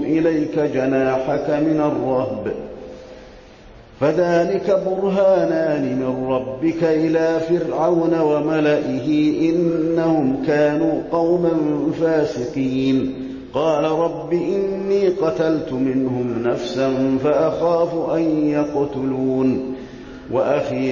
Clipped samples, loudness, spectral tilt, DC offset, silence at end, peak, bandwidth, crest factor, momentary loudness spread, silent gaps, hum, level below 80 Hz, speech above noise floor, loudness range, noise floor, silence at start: under 0.1%; -19 LUFS; -7.5 dB/octave; under 0.1%; 0 s; -6 dBFS; 7.2 kHz; 12 dB; 5 LU; none; none; -50 dBFS; 24 dB; 3 LU; -43 dBFS; 0 s